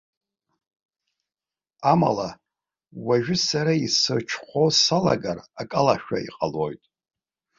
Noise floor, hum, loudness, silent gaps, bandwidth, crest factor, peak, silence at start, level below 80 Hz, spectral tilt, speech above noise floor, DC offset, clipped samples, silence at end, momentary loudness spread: under -90 dBFS; none; -22 LUFS; none; 7.8 kHz; 20 dB; -4 dBFS; 1.8 s; -58 dBFS; -4 dB/octave; over 67 dB; under 0.1%; under 0.1%; 0.8 s; 12 LU